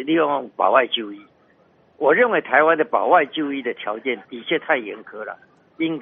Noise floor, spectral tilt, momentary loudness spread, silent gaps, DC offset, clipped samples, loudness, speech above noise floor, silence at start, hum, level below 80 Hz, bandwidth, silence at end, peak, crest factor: -57 dBFS; -1.5 dB/octave; 17 LU; none; under 0.1%; under 0.1%; -20 LUFS; 37 dB; 0 s; none; -72 dBFS; 3.8 kHz; 0 s; -2 dBFS; 20 dB